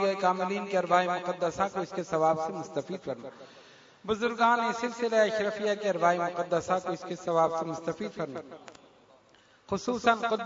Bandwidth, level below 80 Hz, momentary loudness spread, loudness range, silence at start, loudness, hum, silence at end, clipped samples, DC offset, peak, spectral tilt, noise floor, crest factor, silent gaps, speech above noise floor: 7.8 kHz; -68 dBFS; 11 LU; 4 LU; 0 s; -29 LUFS; none; 0 s; under 0.1%; under 0.1%; -10 dBFS; -5 dB/octave; -61 dBFS; 20 dB; none; 32 dB